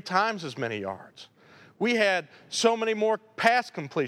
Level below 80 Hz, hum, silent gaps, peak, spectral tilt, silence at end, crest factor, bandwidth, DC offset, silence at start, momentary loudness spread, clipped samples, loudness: -78 dBFS; none; none; -6 dBFS; -3.5 dB/octave; 0 s; 22 dB; 15.5 kHz; under 0.1%; 0.05 s; 10 LU; under 0.1%; -26 LUFS